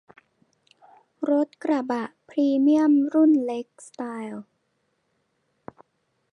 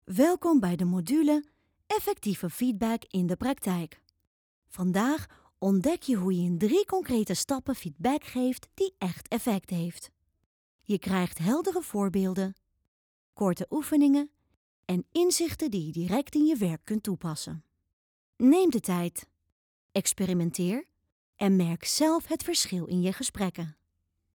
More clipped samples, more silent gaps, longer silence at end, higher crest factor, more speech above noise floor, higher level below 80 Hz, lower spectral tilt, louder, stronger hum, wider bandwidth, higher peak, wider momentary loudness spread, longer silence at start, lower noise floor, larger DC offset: neither; second, none vs 4.27-4.62 s, 10.46-10.79 s, 12.88-13.33 s, 14.57-14.83 s, 17.93-18.33 s, 19.52-19.89 s, 21.12-21.33 s; first, 1.9 s vs 0.65 s; about the same, 16 dB vs 18 dB; about the same, 51 dB vs 50 dB; second, -78 dBFS vs -60 dBFS; about the same, -6 dB/octave vs -5.5 dB/octave; first, -23 LUFS vs -28 LUFS; neither; second, 10 kHz vs over 20 kHz; about the same, -10 dBFS vs -12 dBFS; first, 17 LU vs 9 LU; first, 1.2 s vs 0.1 s; second, -73 dBFS vs -78 dBFS; neither